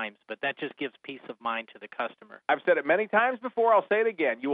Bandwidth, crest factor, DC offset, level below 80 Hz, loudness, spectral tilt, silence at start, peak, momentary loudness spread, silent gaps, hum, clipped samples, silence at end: 4.8 kHz; 18 dB; under 0.1%; -84 dBFS; -27 LUFS; -7.5 dB/octave; 0 s; -10 dBFS; 13 LU; none; none; under 0.1%; 0 s